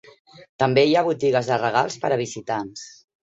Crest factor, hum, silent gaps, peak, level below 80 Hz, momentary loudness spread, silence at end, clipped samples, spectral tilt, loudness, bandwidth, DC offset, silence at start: 18 dB; none; 0.49-0.59 s; -4 dBFS; -62 dBFS; 14 LU; 0.4 s; under 0.1%; -5 dB/octave; -21 LUFS; 8 kHz; under 0.1%; 0.4 s